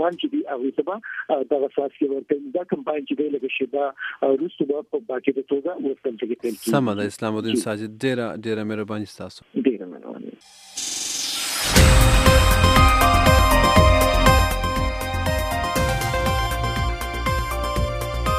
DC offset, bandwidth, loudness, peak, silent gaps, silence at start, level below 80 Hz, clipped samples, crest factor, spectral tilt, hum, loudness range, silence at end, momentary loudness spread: under 0.1%; 16 kHz; -21 LUFS; 0 dBFS; none; 0 s; -26 dBFS; under 0.1%; 20 dB; -4.5 dB/octave; none; 10 LU; 0 s; 13 LU